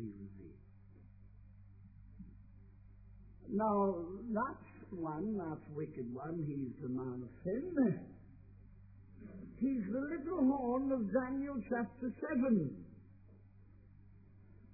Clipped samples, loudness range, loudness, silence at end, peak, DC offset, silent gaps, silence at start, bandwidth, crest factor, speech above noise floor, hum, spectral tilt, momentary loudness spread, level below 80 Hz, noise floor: under 0.1%; 6 LU; -38 LUFS; 0 s; -22 dBFS; under 0.1%; none; 0 s; 2.6 kHz; 18 dB; 23 dB; none; -5.5 dB/octave; 24 LU; -64 dBFS; -61 dBFS